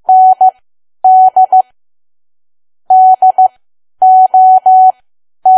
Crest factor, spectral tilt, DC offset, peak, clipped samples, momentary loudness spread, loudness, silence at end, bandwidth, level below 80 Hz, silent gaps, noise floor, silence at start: 8 dB; -5.5 dB/octave; under 0.1%; 0 dBFS; under 0.1%; 7 LU; -7 LUFS; 0 s; 1.3 kHz; -68 dBFS; none; under -90 dBFS; 0.1 s